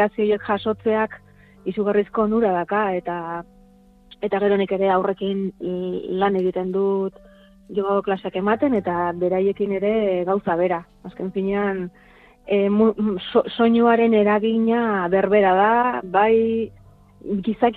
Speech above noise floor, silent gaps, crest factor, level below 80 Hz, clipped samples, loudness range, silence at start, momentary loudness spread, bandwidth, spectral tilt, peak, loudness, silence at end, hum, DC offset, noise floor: 31 dB; none; 16 dB; -54 dBFS; under 0.1%; 6 LU; 0 s; 11 LU; 4.5 kHz; -9 dB/octave; -4 dBFS; -21 LUFS; 0 s; none; under 0.1%; -51 dBFS